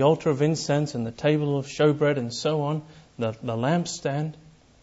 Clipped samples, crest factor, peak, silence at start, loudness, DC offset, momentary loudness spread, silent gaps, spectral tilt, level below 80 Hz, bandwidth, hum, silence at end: under 0.1%; 18 dB; -8 dBFS; 0 s; -25 LUFS; under 0.1%; 9 LU; none; -6 dB/octave; -60 dBFS; 8 kHz; none; 0.35 s